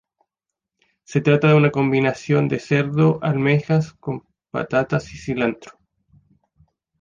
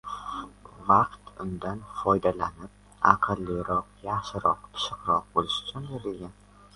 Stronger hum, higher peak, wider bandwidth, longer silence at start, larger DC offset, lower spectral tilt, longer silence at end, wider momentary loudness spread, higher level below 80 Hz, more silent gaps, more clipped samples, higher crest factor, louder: second, none vs 50 Hz at -50 dBFS; second, -4 dBFS vs 0 dBFS; second, 7.4 kHz vs 11.5 kHz; first, 1.1 s vs 0.05 s; neither; first, -7.5 dB/octave vs -5.5 dB/octave; first, 1.3 s vs 0.45 s; about the same, 14 LU vs 16 LU; about the same, -54 dBFS vs -52 dBFS; neither; neither; second, 18 dB vs 28 dB; first, -20 LUFS vs -28 LUFS